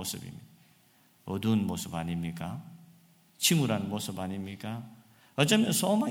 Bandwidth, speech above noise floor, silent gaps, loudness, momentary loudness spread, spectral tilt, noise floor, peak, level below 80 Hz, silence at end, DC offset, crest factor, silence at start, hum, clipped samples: 17.5 kHz; 34 dB; none; -30 LUFS; 18 LU; -4.5 dB/octave; -64 dBFS; -8 dBFS; -64 dBFS; 0 s; under 0.1%; 22 dB; 0 s; none; under 0.1%